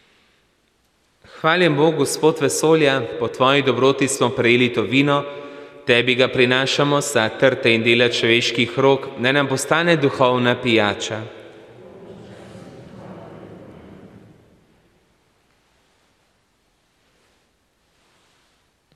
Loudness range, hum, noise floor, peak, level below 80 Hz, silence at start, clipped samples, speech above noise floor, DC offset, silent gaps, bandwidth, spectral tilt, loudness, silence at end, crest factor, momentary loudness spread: 5 LU; none; -64 dBFS; -2 dBFS; -62 dBFS; 1.35 s; under 0.1%; 46 dB; under 0.1%; none; 15 kHz; -4 dB/octave; -17 LUFS; 4.9 s; 18 dB; 17 LU